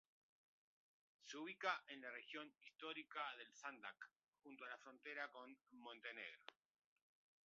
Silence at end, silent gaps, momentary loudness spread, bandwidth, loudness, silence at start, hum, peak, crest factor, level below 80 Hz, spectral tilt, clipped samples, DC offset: 0.95 s; 4.28-4.32 s; 16 LU; 7.2 kHz; -53 LUFS; 1.2 s; none; -30 dBFS; 26 dB; under -90 dBFS; 1 dB/octave; under 0.1%; under 0.1%